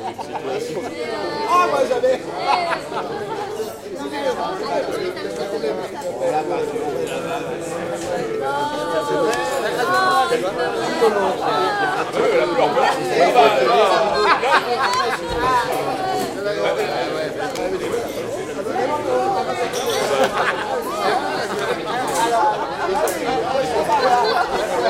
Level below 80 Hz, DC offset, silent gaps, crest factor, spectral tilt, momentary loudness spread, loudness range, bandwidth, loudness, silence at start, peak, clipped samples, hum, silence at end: -50 dBFS; under 0.1%; none; 20 dB; -3.5 dB/octave; 10 LU; 7 LU; 16 kHz; -20 LUFS; 0 s; 0 dBFS; under 0.1%; none; 0 s